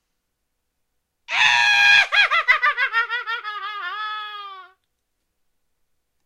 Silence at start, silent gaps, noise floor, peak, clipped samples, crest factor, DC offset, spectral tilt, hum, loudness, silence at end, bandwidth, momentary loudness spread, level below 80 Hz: 1.3 s; none; -75 dBFS; -2 dBFS; under 0.1%; 20 dB; under 0.1%; 2 dB/octave; none; -16 LUFS; 1.6 s; 15 kHz; 17 LU; -62 dBFS